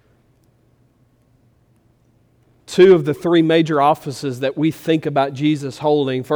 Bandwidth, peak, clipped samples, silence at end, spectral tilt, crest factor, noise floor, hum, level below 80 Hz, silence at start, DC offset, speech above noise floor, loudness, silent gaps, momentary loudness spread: 20 kHz; -2 dBFS; under 0.1%; 0 s; -6.5 dB/octave; 16 dB; -57 dBFS; none; -60 dBFS; 2.7 s; under 0.1%; 41 dB; -17 LUFS; none; 11 LU